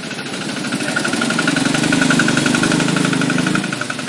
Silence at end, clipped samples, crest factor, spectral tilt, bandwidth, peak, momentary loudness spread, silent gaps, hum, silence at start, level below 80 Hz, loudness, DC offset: 0 s; under 0.1%; 16 dB; -4 dB/octave; 11.5 kHz; -2 dBFS; 8 LU; none; none; 0 s; -50 dBFS; -16 LUFS; under 0.1%